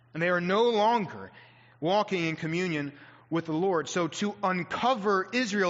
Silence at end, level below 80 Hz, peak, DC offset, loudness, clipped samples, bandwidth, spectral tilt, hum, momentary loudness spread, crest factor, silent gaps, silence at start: 0 s; -72 dBFS; -14 dBFS; under 0.1%; -28 LUFS; under 0.1%; 7.6 kHz; -4 dB/octave; none; 9 LU; 14 dB; none; 0.15 s